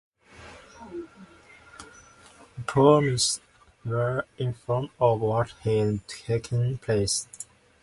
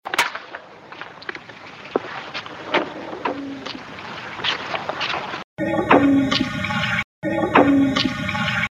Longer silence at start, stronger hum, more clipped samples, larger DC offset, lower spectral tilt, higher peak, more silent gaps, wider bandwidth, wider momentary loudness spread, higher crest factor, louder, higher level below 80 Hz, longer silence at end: first, 0.4 s vs 0.05 s; neither; neither; neither; about the same, -5 dB/octave vs -5 dB/octave; second, -4 dBFS vs 0 dBFS; second, none vs 5.44-5.57 s, 7.04-7.22 s; second, 11.5 kHz vs 16 kHz; first, 25 LU vs 18 LU; about the same, 22 dB vs 22 dB; second, -25 LUFS vs -21 LUFS; about the same, -54 dBFS vs -50 dBFS; first, 0.4 s vs 0.1 s